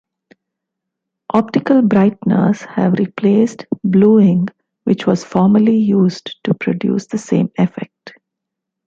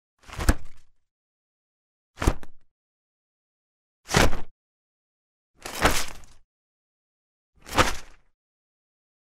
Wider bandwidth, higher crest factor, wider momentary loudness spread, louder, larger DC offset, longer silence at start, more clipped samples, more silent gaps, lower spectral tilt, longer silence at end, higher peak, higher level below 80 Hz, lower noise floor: second, 7.6 kHz vs 16 kHz; second, 14 dB vs 26 dB; second, 9 LU vs 18 LU; first, -15 LUFS vs -26 LUFS; neither; first, 1.35 s vs 0.3 s; neither; second, none vs 1.11-2.14 s, 2.71-4.03 s, 4.51-5.54 s, 6.44-7.53 s; first, -8 dB/octave vs -3.5 dB/octave; second, 0.8 s vs 1.15 s; about the same, -2 dBFS vs -2 dBFS; second, -56 dBFS vs -36 dBFS; second, -80 dBFS vs under -90 dBFS